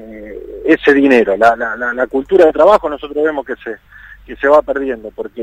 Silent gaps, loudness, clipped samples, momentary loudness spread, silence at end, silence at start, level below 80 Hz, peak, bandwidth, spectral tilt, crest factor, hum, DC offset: none; -12 LUFS; 0.2%; 19 LU; 0 s; 0 s; -44 dBFS; 0 dBFS; 10.5 kHz; -5.5 dB/octave; 14 dB; none; under 0.1%